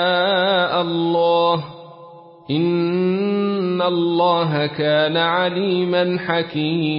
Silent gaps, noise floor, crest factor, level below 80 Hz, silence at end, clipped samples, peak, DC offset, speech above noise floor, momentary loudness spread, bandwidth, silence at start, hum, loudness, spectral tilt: none; -42 dBFS; 14 dB; -64 dBFS; 0 s; under 0.1%; -4 dBFS; under 0.1%; 24 dB; 4 LU; 5.4 kHz; 0 s; none; -18 LUFS; -11 dB/octave